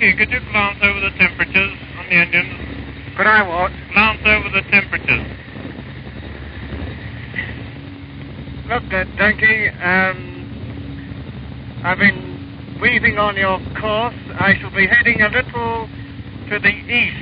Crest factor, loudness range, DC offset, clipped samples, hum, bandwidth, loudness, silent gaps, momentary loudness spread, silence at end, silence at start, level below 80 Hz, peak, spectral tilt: 18 dB; 9 LU; under 0.1%; under 0.1%; none; 5.4 kHz; -15 LUFS; none; 19 LU; 0 s; 0 s; -36 dBFS; 0 dBFS; -2.5 dB/octave